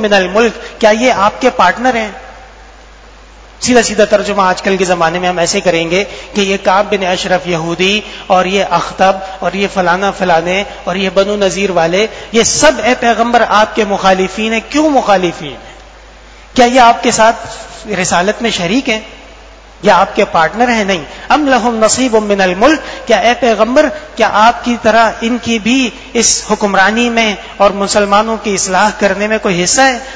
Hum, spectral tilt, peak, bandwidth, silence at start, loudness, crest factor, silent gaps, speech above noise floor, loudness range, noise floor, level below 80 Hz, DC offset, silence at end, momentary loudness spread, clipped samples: none; -3 dB/octave; 0 dBFS; 8 kHz; 0 s; -11 LUFS; 12 dB; none; 25 dB; 3 LU; -36 dBFS; -38 dBFS; 0.3%; 0 s; 7 LU; 0.5%